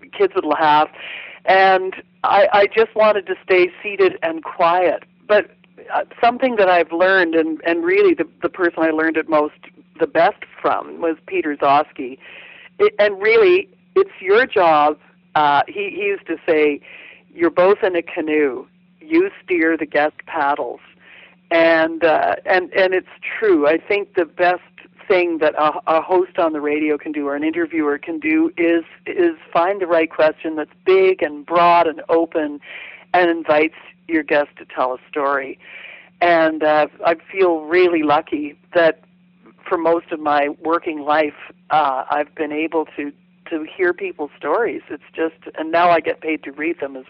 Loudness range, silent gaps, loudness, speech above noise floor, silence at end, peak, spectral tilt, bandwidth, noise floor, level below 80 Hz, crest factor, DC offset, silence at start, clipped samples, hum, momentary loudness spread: 4 LU; none; -18 LUFS; 33 dB; 0.05 s; -8 dBFS; -7.5 dB/octave; 5.8 kHz; -51 dBFS; -64 dBFS; 10 dB; under 0.1%; 0.15 s; under 0.1%; none; 11 LU